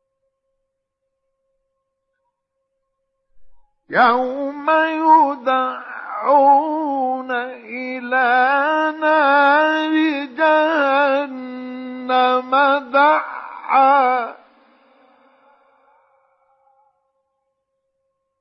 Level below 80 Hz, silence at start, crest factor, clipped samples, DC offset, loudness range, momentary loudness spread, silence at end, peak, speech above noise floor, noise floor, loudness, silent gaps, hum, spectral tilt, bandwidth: -72 dBFS; 3.35 s; 16 dB; under 0.1%; under 0.1%; 5 LU; 16 LU; 4.05 s; -2 dBFS; 60 dB; -76 dBFS; -16 LUFS; none; none; -5 dB/octave; 6.2 kHz